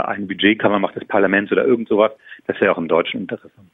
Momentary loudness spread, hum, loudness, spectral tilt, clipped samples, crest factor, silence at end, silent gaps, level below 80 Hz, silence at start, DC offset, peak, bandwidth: 11 LU; none; -18 LUFS; -8.5 dB/octave; under 0.1%; 16 dB; 0.35 s; none; -60 dBFS; 0 s; under 0.1%; -2 dBFS; 4 kHz